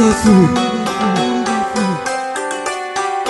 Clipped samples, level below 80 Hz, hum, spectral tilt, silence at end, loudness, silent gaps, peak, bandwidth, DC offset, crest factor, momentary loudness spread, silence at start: under 0.1%; -40 dBFS; none; -5 dB/octave; 0 s; -16 LUFS; none; 0 dBFS; 12 kHz; under 0.1%; 14 dB; 10 LU; 0 s